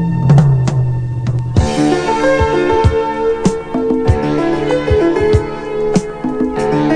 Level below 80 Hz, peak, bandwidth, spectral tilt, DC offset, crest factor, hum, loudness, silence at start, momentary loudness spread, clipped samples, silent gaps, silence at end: -26 dBFS; 0 dBFS; 10.5 kHz; -7.5 dB/octave; under 0.1%; 14 dB; none; -14 LUFS; 0 s; 7 LU; under 0.1%; none; 0 s